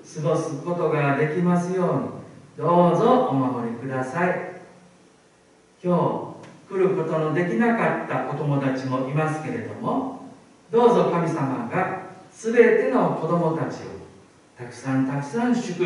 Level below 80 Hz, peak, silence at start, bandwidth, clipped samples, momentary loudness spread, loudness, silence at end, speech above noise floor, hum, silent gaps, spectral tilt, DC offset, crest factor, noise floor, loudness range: -68 dBFS; -4 dBFS; 0.05 s; 11 kHz; under 0.1%; 16 LU; -23 LUFS; 0 s; 34 dB; none; none; -7.5 dB/octave; under 0.1%; 20 dB; -56 dBFS; 5 LU